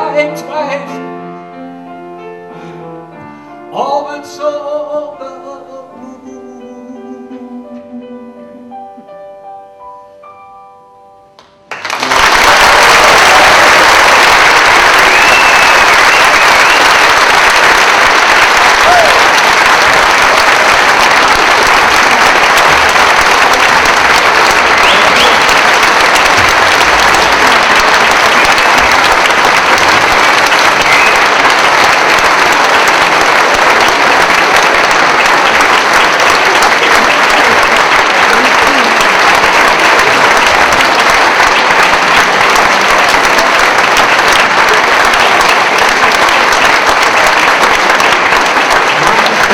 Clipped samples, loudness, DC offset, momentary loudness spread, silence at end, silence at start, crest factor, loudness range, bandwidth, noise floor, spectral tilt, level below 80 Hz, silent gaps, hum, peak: 0.2%; -5 LUFS; under 0.1%; 4 LU; 0 s; 0 s; 8 dB; 15 LU; over 20 kHz; -41 dBFS; -1 dB/octave; -34 dBFS; none; none; 0 dBFS